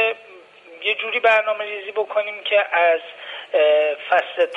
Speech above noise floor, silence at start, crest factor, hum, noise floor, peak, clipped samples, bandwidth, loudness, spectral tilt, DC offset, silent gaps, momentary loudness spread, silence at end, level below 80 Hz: 26 dB; 0 s; 16 dB; none; -45 dBFS; -4 dBFS; under 0.1%; 7.6 kHz; -19 LUFS; -2 dB/octave; under 0.1%; none; 9 LU; 0 s; -74 dBFS